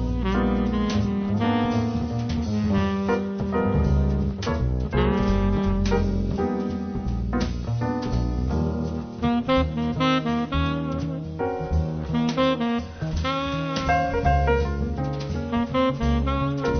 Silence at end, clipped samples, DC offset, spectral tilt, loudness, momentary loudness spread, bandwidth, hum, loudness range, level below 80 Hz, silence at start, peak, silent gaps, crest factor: 0 s; under 0.1%; under 0.1%; -7.5 dB/octave; -24 LUFS; 6 LU; 6.6 kHz; none; 2 LU; -30 dBFS; 0 s; -8 dBFS; none; 16 dB